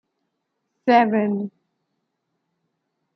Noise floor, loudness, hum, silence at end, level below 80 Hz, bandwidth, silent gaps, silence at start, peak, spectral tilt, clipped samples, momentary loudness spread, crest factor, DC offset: -77 dBFS; -20 LUFS; none; 1.65 s; -78 dBFS; 6 kHz; none; 0.85 s; -4 dBFS; -8 dB/octave; under 0.1%; 12 LU; 22 dB; under 0.1%